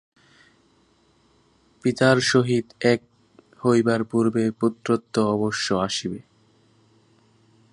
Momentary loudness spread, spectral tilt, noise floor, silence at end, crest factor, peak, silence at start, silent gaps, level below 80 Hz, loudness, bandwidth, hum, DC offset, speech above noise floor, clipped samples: 8 LU; -5 dB/octave; -61 dBFS; 1.5 s; 22 dB; -2 dBFS; 1.85 s; none; -60 dBFS; -22 LUFS; 11 kHz; none; under 0.1%; 40 dB; under 0.1%